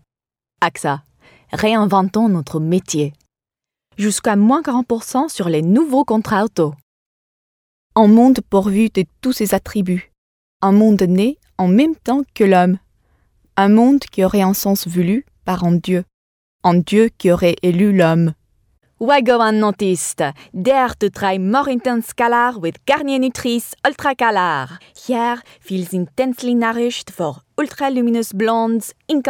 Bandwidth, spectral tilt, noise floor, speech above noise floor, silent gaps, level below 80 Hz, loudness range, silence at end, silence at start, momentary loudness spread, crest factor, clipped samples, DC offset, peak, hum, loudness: 19.5 kHz; -6 dB/octave; under -90 dBFS; over 75 dB; 6.83-7.90 s, 10.18-10.60 s, 16.14-16.59 s; -50 dBFS; 4 LU; 0 s; 0.6 s; 10 LU; 16 dB; under 0.1%; under 0.1%; 0 dBFS; none; -16 LUFS